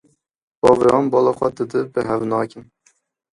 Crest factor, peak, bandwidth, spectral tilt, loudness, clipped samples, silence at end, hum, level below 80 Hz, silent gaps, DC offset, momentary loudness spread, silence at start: 18 dB; 0 dBFS; 11.5 kHz; -7 dB/octave; -18 LUFS; under 0.1%; 0.7 s; none; -52 dBFS; none; under 0.1%; 9 LU; 0.65 s